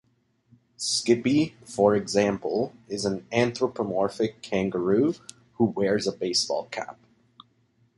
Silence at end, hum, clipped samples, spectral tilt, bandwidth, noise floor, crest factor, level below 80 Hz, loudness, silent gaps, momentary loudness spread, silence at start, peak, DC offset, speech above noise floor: 1.05 s; none; under 0.1%; -4.5 dB/octave; 11.5 kHz; -66 dBFS; 20 dB; -60 dBFS; -26 LUFS; none; 9 LU; 0.8 s; -6 dBFS; under 0.1%; 41 dB